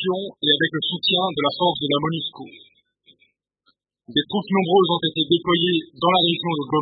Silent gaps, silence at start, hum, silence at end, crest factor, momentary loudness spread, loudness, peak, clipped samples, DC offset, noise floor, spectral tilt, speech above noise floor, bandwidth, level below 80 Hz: none; 0 s; none; 0 s; 18 dB; 7 LU; -20 LUFS; -4 dBFS; under 0.1%; under 0.1%; -67 dBFS; -10 dB/octave; 46 dB; 4.9 kHz; -62 dBFS